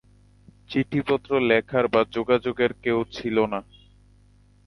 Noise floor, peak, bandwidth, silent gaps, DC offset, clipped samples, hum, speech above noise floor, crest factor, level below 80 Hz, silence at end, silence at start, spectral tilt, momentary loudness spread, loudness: -56 dBFS; -6 dBFS; 11 kHz; none; under 0.1%; under 0.1%; 50 Hz at -50 dBFS; 33 dB; 20 dB; -54 dBFS; 1.05 s; 0.7 s; -7 dB/octave; 6 LU; -24 LUFS